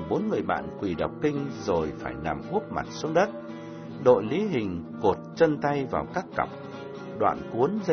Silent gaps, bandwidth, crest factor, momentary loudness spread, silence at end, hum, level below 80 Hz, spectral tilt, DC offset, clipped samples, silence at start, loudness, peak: none; 6.6 kHz; 22 dB; 12 LU; 0 s; none; -54 dBFS; -7 dB/octave; under 0.1%; under 0.1%; 0 s; -27 LUFS; -6 dBFS